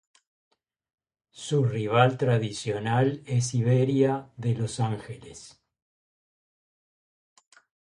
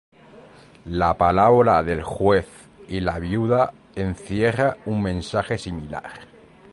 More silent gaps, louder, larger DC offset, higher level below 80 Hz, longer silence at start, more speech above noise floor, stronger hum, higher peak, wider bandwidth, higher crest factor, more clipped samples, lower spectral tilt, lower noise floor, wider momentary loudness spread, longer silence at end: neither; second, -26 LUFS vs -21 LUFS; neither; second, -64 dBFS vs -42 dBFS; first, 1.35 s vs 0.35 s; first, over 65 dB vs 26 dB; neither; about the same, -6 dBFS vs -4 dBFS; about the same, 11 kHz vs 11.5 kHz; about the same, 22 dB vs 18 dB; neither; about the same, -6.5 dB/octave vs -7 dB/octave; first, under -90 dBFS vs -47 dBFS; about the same, 17 LU vs 16 LU; first, 2.45 s vs 0.5 s